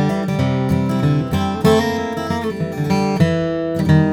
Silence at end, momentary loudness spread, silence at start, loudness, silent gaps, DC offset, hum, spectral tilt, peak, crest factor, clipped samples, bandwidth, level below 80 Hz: 0 s; 7 LU; 0 s; -18 LUFS; none; under 0.1%; none; -7 dB/octave; -2 dBFS; 16 dB; under 0.1%; 16.5 kHz; -44 dBFS